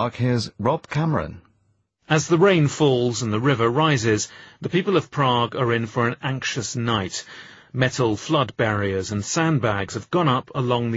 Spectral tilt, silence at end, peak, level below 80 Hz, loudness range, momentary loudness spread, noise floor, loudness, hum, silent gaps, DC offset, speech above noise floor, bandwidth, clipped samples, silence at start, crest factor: -5 dB/octave; 0 s; -2 dBFS; -54 dBFS; 3 LU; 7 LU; -66 dBFS; -22 LUFS; none; none; under 0.1%; 45 dB; 8.4 kHz; under 0.1%; 0 s; 20 dB